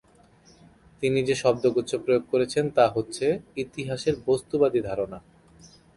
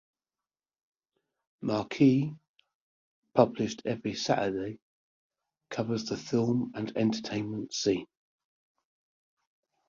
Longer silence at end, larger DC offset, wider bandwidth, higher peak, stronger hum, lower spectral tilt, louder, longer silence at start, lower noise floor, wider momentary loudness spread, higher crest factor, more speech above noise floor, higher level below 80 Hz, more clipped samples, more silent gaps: second, 0.8 s vs 1.85 s; neither; first, 11.5 kHz vs 7.6 kHz; about the same, -6 dBFS vs -8 dBFS; neither; about the same, -5.5 dB/octave vs -6 dB/octave; first, -25 LUFS vs -30 LUFS; second, 1 s vs 1.6 s; second, -56 dBFS vs under -90 dBFS; second, 9 LU vs 12 LU; about the same, 20 dB vs 24 dB; second, 32 dB vs over 61 dB; first, -58 dBFS vs -68 dBFS; neither; second, none vs 2.48-2.54 s, 2.75-3.22 s, 4.82-5.30 s